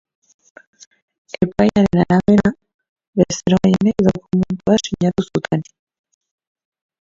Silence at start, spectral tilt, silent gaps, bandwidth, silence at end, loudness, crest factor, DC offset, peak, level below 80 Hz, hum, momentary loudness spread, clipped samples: 1.4 s; -6.5 dB/octave; 2.74-2.79 s, 2.89-2.96 s, 3.07-3.13 s; 7.6 kHz; 1.4 s; -17 LUFS; 18 dB; under 0.1%; 0 dBFS; -44 dBFS; none; 8 LU; under 0.1%